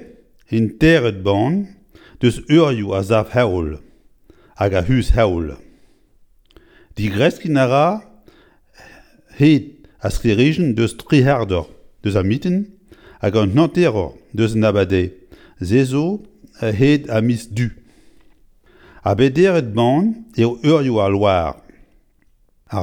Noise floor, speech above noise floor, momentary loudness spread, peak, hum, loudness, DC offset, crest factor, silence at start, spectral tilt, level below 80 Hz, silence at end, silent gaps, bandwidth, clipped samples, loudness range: -56 dBFS; 40 dB; 11 LU; 0 dBFS; none; -17 LUFS; under 0.1%; 18 dB; 0 s; -7 dB/octave; -34 dBFS; 0 s; none; 17 kHz; under 0.1%; 4 LU